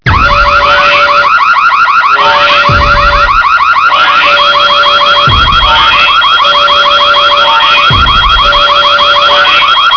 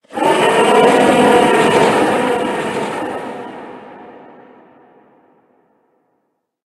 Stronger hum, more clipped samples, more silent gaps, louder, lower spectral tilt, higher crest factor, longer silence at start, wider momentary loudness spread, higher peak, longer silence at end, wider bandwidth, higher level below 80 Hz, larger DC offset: neither; first, 0.3% vs under 0.1%; neither; first, -4 LUFS vs -13 LUFS; second, -3 dB/octave vs -4.5 dB/octave; second, 6 dB vs 16 dB; about the same, 0.05 s vs 0.1 s; second, 1 LU vs 20 LU; about the same, 0 dBFS vs 0 dBFS; second, 0 s vs 2.55 s; second, 5.4 kHz vs 12.5 kHz; first, -20 dBFS vs -54 dBFS; first, 0.4% vs under 0.1%